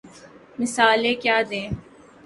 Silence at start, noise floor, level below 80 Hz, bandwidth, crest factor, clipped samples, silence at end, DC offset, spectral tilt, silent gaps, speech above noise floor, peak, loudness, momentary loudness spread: 0.05 s; -47 dBFS; -50 dBFS; 11.5 kHz; 20 dB; under 0.1%; 0.45 s; under 0.1%; -3.5 dB/octave; none; 26 dB; -2 dBFS; -21 LUFS; 16 LU